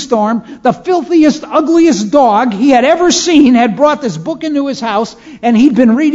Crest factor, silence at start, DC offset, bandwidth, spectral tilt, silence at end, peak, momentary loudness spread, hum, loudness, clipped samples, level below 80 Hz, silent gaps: 10 dB; 0 s; under 0.1%; 7.8 kHz; -4.5 dB/octave; 0 s; 0 dBFS; 9 LU; none; -10 LUFS; 0.4%; -46 dBFS; none